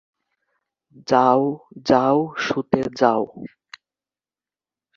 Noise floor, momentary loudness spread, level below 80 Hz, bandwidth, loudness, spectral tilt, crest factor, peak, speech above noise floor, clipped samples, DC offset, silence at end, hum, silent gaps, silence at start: under -90 dBFS; 17 LU; -60 dBFS; 7.4 kHz; -20 LUFS; -6 dB/octave; 20 dB; -2 dBFS; over 70 dB; under 0.1%; under 0.1%; 1.5 s; 50 Hz at -60 dBFS; none; 1.1 s